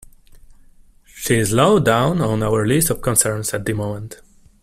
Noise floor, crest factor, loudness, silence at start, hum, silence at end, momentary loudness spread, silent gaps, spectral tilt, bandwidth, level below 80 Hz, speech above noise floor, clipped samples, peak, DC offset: -48 dBFS; 20 dB; -17 LUFS; 1.15 s; none; 0.5 s; 13 LU; none; -4.5 dB/octave; 16 kHz; -42 dBFS; 30 dB; under 0.1%; 0 dBFS; under 0.1%